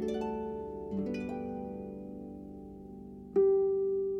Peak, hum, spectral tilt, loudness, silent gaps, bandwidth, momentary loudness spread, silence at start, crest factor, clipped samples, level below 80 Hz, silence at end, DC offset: -18 dBFS; none; -8.5 dB/octave; -33 LUFS; none; 7 kHz; 20 LU; 0 s; 16 dB; under 0.1%; -58 dBFS; 0 s; under 0.1%